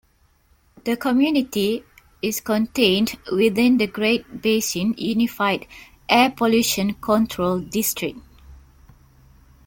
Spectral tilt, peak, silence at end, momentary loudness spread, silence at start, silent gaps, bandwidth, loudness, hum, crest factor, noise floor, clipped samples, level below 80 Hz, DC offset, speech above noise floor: -4 dB/octave; -2 dBFS; 1.1 s; 10 LU; 0.85 s; none; 17 kHz; -21 LUFS; none; 20 dB; -59 dBFS; under 0.1%; -52 dBFS; under 0.1%; 39 dB